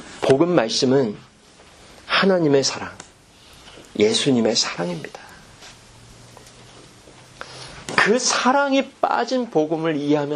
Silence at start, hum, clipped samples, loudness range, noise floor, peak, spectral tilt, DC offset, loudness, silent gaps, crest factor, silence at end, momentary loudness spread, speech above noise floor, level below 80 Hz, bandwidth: 0 s; none; under 0.1%; 7 LU; -49 dBFS; 0 dBFS; -4 dB/octave; under 0.1%; -19 LUFS; none; 22 dB; 0 s; 18 LU; 30 dB; -58 dBFS; 12 kHz